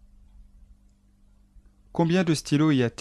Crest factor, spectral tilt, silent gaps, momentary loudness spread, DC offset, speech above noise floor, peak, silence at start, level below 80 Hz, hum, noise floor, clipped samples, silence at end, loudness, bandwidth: 16 dB; -6 dB/octave; none; 5 LU; under 0.1%; 37 dB; -10 dBFS; 1.95 s; -54 dBFS; 50 Hz at -55 dBFS; -59 dBFS; under 0.1%; 0.1 s; -24 LUFS; 13 kHz